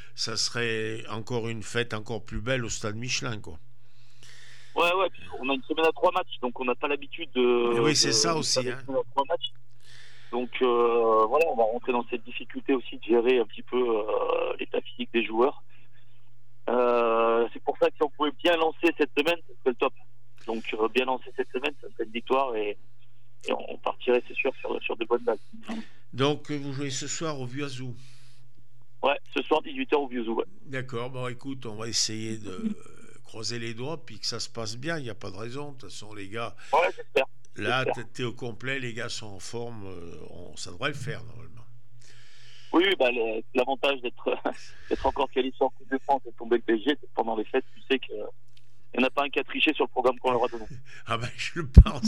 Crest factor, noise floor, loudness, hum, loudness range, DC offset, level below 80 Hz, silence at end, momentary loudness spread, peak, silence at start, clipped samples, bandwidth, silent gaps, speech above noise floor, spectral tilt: 28 dB; -62 dBFS; -28 LUFS; none; 7 LU; 2%; -38 dBFS; 0 s; 14 LU; 0 dBFS; 0.15 s; under 0.1%; 15 kHz; none; 34 dB; -4.5 dB/octave